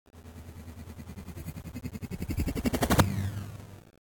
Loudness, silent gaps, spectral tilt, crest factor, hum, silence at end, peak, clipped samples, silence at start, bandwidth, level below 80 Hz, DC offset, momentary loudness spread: -31 LUFS; none; -5.5 dB/octave; 24 dB; none; 0.1 s; -10 dBFS; under 0.1%; 0.15 s; 18 kHz; -42 dBFS; under 0.1%; 21 LU